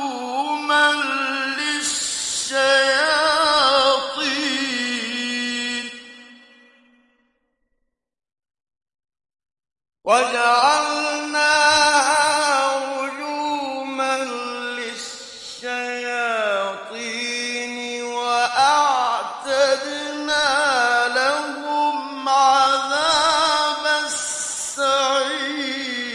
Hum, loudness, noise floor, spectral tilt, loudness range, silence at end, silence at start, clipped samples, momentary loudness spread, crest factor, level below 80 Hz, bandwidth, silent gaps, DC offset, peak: none; -19 LUFS; -73 dBFS; 0 dB/octave; 8 LU; 0 s; 0 s; under 0.1%; 11 LU; 18 dB; -62 dBFS; 11.5 kHz; none; under 0.1%; -4 dBFS